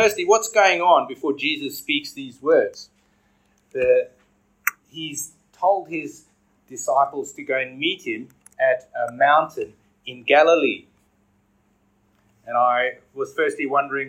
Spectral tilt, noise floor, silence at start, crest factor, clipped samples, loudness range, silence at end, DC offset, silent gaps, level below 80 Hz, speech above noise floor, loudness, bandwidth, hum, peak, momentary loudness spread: -2.5 dB/octave; -63 dBFS; 0 s; 20 dB; under 0.1%; 5 LU; 0 s; under 0.1%; none; -66 dBFS; 43 dB; -21 LUFS; 16 kHz; none; -2 dBFS; 17 LU